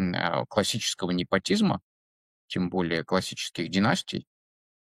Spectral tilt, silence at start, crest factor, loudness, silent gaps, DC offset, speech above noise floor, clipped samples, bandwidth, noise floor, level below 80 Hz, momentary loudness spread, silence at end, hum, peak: -4.5 dB/octave; 0 s; 20 dB; -27 LUFS; 1.83-2.48 s; under 0.1%; over 63 dB; under 0.1%; 14.5 kHz; under -90 dBFS; -60 dBFS; 8 LU; 0.65 s; none; -8 dBFS